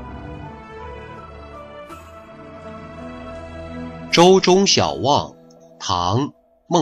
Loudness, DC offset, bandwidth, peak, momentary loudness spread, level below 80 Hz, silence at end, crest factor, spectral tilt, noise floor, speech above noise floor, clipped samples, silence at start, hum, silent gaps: -16 LUFS; under 0.1%; 11.5 kHz; -2 dBFS; 24 LU; -46 dBFS; 0 s; 18 dB; -4.5 dB/octave; -40 dBFS; 25 dB; under 0.1%; 0 s; none; none